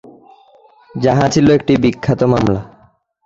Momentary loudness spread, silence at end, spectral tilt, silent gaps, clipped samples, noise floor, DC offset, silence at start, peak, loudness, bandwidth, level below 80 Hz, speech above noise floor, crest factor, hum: 7 LU; 0.6 s; -6.5 dB/octave; none; under 0.1%; -52 dBFS; under 0.1%; 0.95 s; -2 dBFS; -14 LUFS; 7.8 kHz; -40 dBFS; 39 dB; 14 dB; none